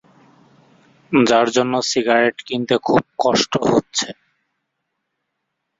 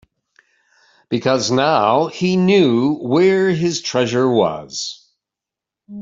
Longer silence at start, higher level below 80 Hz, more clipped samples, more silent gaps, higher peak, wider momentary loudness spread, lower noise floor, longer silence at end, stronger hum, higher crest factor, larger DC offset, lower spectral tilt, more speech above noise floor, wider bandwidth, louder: about the same, 1.1 s vs 1.1 s; about the same, -56 dBFS vs -60 dBFS; neither; neither; about the same, -2 dBFS vs -2 dBFS; second, 8 LU vs 11 LU; second, -76 dBFS vs -86 dBFS; first, 1.65 s vs 0 s; neither; about the same, 18 dB vs 16 dB; neither; second, -4 dB/octave vs -5.5 dB/octave; second, 59 dB vs 70 dB; about the same, 7.8 kHz vs 7.8 kHz; about the same, -18 LUFS vs -16 LUFS